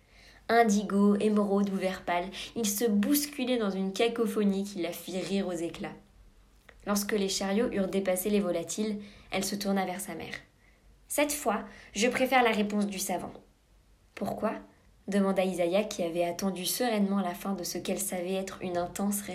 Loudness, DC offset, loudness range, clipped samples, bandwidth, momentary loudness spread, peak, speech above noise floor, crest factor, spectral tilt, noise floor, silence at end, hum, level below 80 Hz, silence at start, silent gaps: -30 LUFS; under 0.1%; 4 LU; under 0.1%; 16 kHz; 11 LU; -10 dBFS; 33 dB; 20 dB; -4.5 dB/octave; -62 dBFS; 0 s; none; -60 dBFS; 0.25 s; none